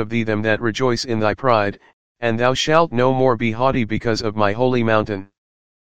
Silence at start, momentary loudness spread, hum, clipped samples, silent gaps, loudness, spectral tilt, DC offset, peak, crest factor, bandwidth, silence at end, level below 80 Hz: 0 s; 6 LU; none; under 0.1%; 1.93-2.15 s; -19 LUFS; -5.5 dB/octave; 2%; 0 dBFS; 18 dB; 9.4 kHz; 0.5 s; -46 dBFS